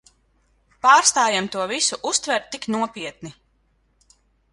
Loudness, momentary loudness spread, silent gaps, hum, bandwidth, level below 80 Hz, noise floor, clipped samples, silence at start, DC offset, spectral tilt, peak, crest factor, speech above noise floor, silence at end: -19 LUFS; 19 LU; none; none; 11.5 kHz; -62 dBFS; -64 dBFS; under 0.1%; 0.85 s; under 0.1%; -1 dB/octave; -2 dBFS; 22 dB; 44 dB; 1.2 s